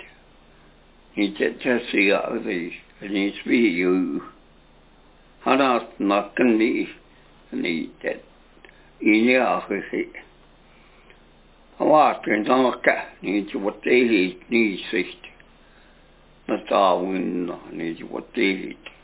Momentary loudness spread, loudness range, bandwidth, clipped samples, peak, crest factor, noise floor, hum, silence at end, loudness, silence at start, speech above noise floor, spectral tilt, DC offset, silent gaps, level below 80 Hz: 13 LU; 4 LU; 4 kHz; under 0.1%; -2 dBFS; 20 dB; -53 dBFS; none; 0.15 s; -22 LUFS; 0 s; 31 dB; -9 dB/octave; under 0.1%; none; -58 dBFS